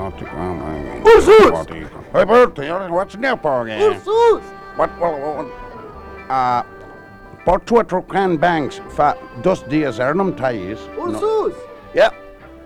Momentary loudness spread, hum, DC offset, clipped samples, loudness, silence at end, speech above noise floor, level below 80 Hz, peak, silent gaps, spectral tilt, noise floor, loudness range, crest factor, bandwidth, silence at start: 16 LU; none; under 0.1%; under 0.1%; -16 LUFS; 0 s; 23 dB; -40 dBFS; -2 dBFS; none; -6 dB/octave; -39 dBFS; 7 LU; 14 dB; 12.5 kHz; 0 s